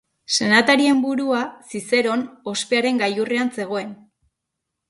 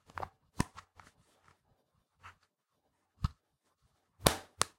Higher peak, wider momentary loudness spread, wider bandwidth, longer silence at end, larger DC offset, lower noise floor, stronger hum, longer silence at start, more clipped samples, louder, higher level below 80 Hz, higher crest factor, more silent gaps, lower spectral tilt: about the same, -2 dBFS vs -4 dBFS; second, 12 LU vs 26 LU; second, 11.5 kHz vs 16.5 kHz; first, 0.95 s vs 0.1 s; neither; about the same, -80 dBFS vs -81 dBFS; neither; first, 0.3 s vs 0.15 s; neither; first, -20 LUFS vs -36 LUFS; second, -66 dBFS vs -52 dBFS; second, 20 dB vs 38 dB; neither; about the same, -3 dB/octave vs -3.5 dB/octave